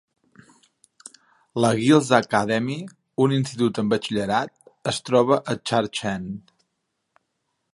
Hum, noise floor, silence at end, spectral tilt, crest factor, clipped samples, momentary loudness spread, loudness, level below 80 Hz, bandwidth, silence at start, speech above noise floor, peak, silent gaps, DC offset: none; -77 dBFS; 1.35 s; -5.5 dB/octave; 22 dB; under 0.1%; 15 LU; -22 LUFS; -60 dBFS; 11.5 kHz; 1.55 s; 55 dB; -2 dBFS; none; under 0.1%